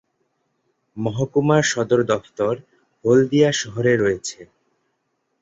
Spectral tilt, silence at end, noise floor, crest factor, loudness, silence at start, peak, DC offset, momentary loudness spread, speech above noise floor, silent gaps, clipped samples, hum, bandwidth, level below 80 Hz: -5 dB/octave; 0.95 s; -72 dBFS; 18 dB; -20 LUFS; 0.95 s; -4 dBFS; under 0.1%; 11 LU; 53 dB; none; under 0.1%; none; 8 kHz; -56 dBFS